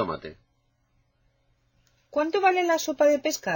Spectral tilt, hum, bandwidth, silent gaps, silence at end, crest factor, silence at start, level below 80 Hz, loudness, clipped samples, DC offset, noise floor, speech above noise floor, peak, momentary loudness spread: -3.5 dB/octave; none; 17 kHz; none; 0 s; 18 dB; 0 s; -64 dBFS; -24 LUFS; under 0.1%; under 0.1%; -70 dBFS; 46 dB; -10 dBFS; 12 LU